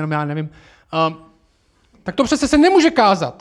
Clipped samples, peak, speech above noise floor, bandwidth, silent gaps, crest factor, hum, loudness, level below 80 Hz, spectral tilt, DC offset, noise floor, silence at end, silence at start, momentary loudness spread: under 0.1%; -2 dBFS; 42 dB; 12 kHz; none; 16 dB; none; -16 LUFS; -44 dBFS; -5 dB/octave; under 0.1%; -58 dBFS; 0.1 s; 0 s; 14 LU